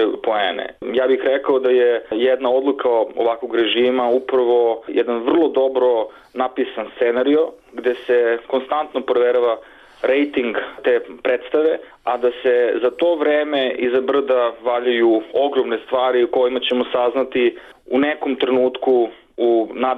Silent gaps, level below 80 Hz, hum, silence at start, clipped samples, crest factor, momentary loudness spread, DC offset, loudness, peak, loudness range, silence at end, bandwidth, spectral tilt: none; -60 dBFS; none; 0 s; under 0.1%; 10 dB; 6 LU; under 0.1%; -18 LUFS; -8 dBFS; 2 LU; 0 s; 4.2 kHz; -6 dB/octave